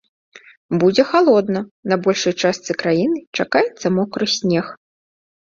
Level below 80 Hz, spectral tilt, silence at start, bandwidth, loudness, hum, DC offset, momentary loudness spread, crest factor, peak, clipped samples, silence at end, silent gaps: -60 dBFS; -5 dB/octave; 0.35 s; 7.6 kHz; -18 LUFS; none; under 0.1%; 8 LU; 18 dB; -2 dBFS; under 0.1%; 0.85 s; 0.57-0.69 s, 1.71-1.83 s, 3.27-3.33 s